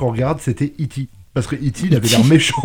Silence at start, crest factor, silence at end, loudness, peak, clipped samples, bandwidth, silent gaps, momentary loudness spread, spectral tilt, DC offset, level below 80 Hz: 0 s; 16 dB; 0 s; -17 LUFS; -2 dBFS; under 0.1%; 19 kHz; none; 13 LU; -5 dB/octave; under 0.1%; -42 dBFS